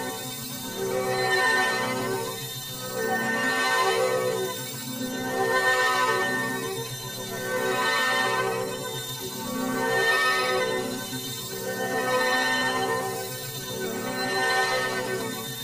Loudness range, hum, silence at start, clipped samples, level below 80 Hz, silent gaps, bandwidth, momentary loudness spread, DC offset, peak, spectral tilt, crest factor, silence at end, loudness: 2 LU; none; 0 s; under 0.1%; -62 dBFS; none; 16 kHz; 10 LU; under 0.1%; -10 dBFS; -2.5 dB/octave; 16 dB; 0 s; -26 LUFS